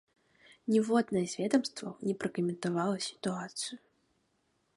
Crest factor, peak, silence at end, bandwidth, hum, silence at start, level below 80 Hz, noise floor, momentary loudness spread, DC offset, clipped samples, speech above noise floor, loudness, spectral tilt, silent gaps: 20 dB; -14 dBFS; 1 s; 11.5 kHz; none; 0.65 s; -76 dBFS; -76 dBFS; 10 LU; under 0.1%; under 0.1%; 44 dB; -33 LUFS; -5 dB/octave; none